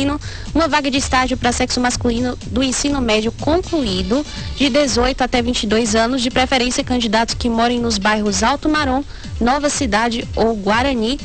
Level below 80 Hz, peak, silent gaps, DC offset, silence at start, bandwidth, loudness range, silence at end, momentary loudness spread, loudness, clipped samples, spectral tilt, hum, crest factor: -30 dBFS; -4 dBFS; none; 1%; 0 s; 9 kHz; 1 LU; 0 s; 5 LU; -17 LUFS; under 0.1%; -3.5 dB/octave; none; 14 dB